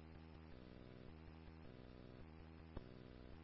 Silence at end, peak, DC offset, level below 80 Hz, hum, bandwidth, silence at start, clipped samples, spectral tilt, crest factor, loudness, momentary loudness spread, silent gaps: 0 s; -34 dBFS; under 0.1%; -64 dBFS; none; 5.6 kHz; 0 s; under 0.1%; -6.5 dB/octave; 24 dB; -60 LUFS; 3 LU; none